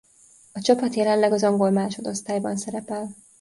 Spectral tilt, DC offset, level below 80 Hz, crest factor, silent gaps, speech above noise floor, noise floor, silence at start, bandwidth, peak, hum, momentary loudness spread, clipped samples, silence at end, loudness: -5 dB/octave; under 0.1%; -66 dBFS; 18 dB; none; 32 dB; -54 dBFS; 0.55 s; 11.5 kHz; -4 dBFS; none; 12 LU; under 0.1%; 0.3 s; -23 LUFS